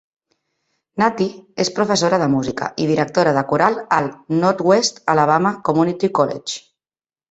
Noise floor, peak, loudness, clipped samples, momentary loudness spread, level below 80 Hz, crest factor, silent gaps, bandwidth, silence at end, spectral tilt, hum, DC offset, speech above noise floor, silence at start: under -90 dBFS; 0 dBFS; -18 LUFS; under 0.1%; 8 LU; -58 dBFS; 18 dB; none; 8.2 kHz; 0.7 s; -5 dB/octave; none; under 0.1%; over 73 dB; 0.95 s